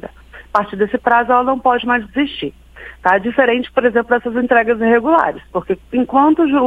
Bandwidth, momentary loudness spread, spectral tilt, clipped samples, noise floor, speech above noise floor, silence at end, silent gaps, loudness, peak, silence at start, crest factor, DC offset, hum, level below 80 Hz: 5.6 kHz; 8 LU; -7 dB/octave; under 0.1%; -36 dBFS; 21 dB; 0 s; none; -15 LUFS; 0 dBFS; 0.05 s; 16 dB; under 0.1%; none; -44 dBFS